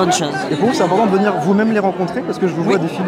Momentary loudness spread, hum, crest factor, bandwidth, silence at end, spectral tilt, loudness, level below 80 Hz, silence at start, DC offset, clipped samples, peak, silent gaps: 5 LU; none; 12 dB; 15.5 kHz; 0 s; -5.5 dB/octave; -16 LUFS; -58 dBFS; 0 s; under 0.1%; under 0.1%; -4 dBFS; none